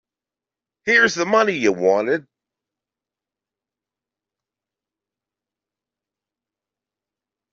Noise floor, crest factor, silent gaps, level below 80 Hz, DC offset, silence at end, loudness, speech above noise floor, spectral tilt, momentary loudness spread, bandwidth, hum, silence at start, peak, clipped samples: -89 dBFS; 22 dB; none; -68 dBFS; under 0.1%; 5.3 s; -18 LUFS; 72 dB; -2 dB/octave; 9 LU; 7.8 kHz; none; 0.85 s; -2 dBFS; under 0.1%